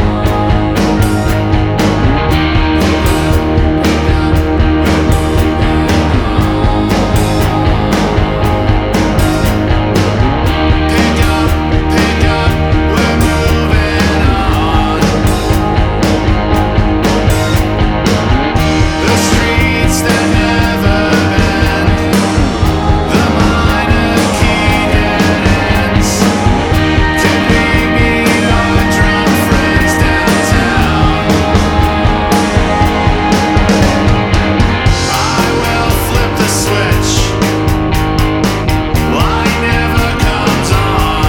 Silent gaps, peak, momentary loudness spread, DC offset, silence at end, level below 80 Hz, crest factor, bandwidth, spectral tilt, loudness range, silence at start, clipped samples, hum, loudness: none; 0 dBFS; 2 LU; under 0.1%; 0 s; -16 dBFS; 10 dB; over 20 kHz; -5.5 dB/octave; 2 LU; 0 s; under 0.1%; none; -11 LUFS